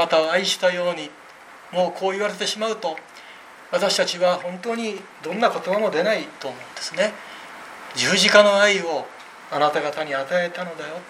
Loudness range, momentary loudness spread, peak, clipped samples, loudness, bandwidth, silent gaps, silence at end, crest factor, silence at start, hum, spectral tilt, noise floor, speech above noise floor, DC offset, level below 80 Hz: 6 LU; 20 LU; 0 dBFS; under 0.1%; -21 LUFS; 15 kHz; none; 0 s; 22 dB; 0 s; none; -2.5 dB/octave; -44 dBFS; 22 dB; under 0.1%; -72 dBFS